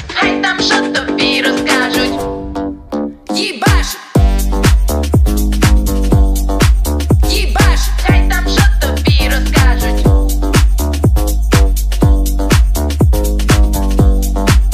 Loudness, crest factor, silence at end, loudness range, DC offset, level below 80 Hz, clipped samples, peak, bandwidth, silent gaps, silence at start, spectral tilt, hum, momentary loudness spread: -13 LUFS; 10 dB; 0 s; 2 LU; under 0.1%; -14 dBFS; under 0.1%; 0 dBFS; 15.5 kHz; none; 0 s; -5 dB/octave; none; 4 LU